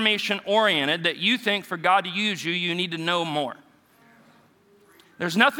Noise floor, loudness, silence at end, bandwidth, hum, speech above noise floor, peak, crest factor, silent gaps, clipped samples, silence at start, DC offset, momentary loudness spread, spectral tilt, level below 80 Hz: -58 dBFS; -23 LUFS; 0 s; 19 kHz; none; 34 dB; -2 dBFS; 22 dB; none; under 0.1%; 0 s; under 0.1%; 7 LU; -4 dB/octave; -80 dBFS